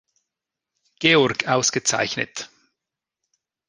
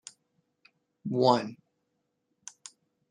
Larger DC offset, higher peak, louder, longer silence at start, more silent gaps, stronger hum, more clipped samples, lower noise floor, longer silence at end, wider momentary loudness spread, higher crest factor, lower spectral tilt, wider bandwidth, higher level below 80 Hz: neither; first, -2 dBFS vs -8 dBFS; first, -20 LUFS vs -27 LUFS; about the same, 1 s vs 1.05 s; neither; neither; neither; first, -86 dBFS vs -79 dBFS; second, 1.2 s vs 1.55 s; second, 15 LU vs 25 LU; about the same, 22 dB vs 26 dB; second, -2.5 dB/octave vs -5.5 dB/octave; about the same, 10.5 kHz vs 10.5 kHz; first, -62 dBFS vs -80 dBFS